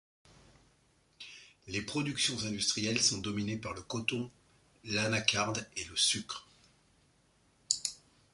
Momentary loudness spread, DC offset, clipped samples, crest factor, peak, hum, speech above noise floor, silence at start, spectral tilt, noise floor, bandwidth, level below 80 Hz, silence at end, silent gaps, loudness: 18 LU; under 0.1%; under 0.1%; 28 dB; -10 dBFS; none; 36 dB; 1.2 s; -2.5 dB/octave; -69 dBFS; 11.5 kHz; -64 dBFS; 0.4 s; none; -32 LUFS